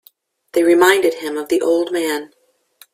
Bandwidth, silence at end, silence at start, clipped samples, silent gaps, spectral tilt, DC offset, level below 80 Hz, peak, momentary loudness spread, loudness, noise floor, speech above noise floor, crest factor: 15.5 kHz; 0.65 s; 0.55 s; under 0.1%; none; -2.5 dB/octave; under 0.1%; -64 dBFS; 0 dBFS; 11 LU; -16 LUFS; -54 dBFS; 38 dB; 18 dB